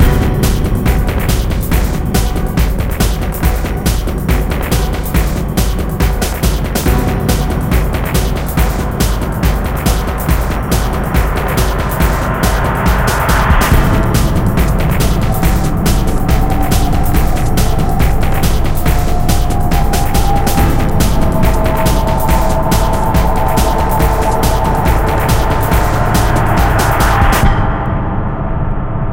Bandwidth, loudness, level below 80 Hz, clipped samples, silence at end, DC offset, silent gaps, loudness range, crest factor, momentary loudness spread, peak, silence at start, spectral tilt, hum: 17.5 kHz; -14 LUFS; -14 dBFS; under 0.1%; 0 s; under 0.1%; none; 3 LU; 12 dB; 4 LU; 0 dBFS; 0 s; -5.5 dB/octave; none